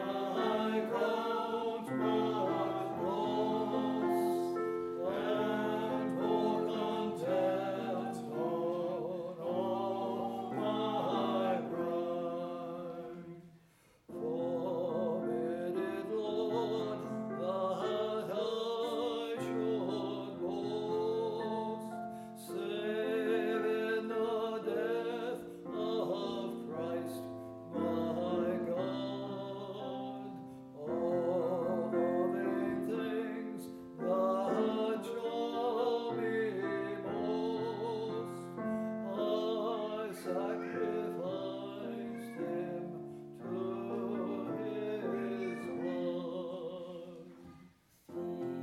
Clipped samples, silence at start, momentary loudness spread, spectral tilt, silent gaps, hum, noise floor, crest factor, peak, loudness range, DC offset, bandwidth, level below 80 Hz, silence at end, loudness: under 0.1%; 0 s; 9 LU; -6.5 dB/octave; none; none; -66 dBFS; 16 dB; -20 dBFS; 5 LU; under 0.1%; 14.5 kHz; -78 dBFS; 0 s; -36 LUFS